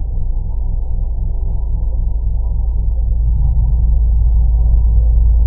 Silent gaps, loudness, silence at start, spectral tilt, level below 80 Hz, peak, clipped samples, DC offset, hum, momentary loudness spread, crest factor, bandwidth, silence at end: none; -18 LUFS; 0 s; -15 dB/octave; -12 dBFS; -2 dBFS; under 0.1%; under 0.1%; none; 8 LU; 10 dB; 1 kHz; 0 s